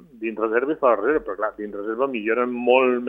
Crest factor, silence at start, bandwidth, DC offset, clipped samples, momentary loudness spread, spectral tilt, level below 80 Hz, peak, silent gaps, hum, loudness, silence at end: 18 dB; 0.15 s; 3.7 kHz; under 0.1%; under 0.1%; 10 LU; -7.5 dB/octave; -58 dBFS; -4 dBFS; none; none; -22 LUFS; 0 s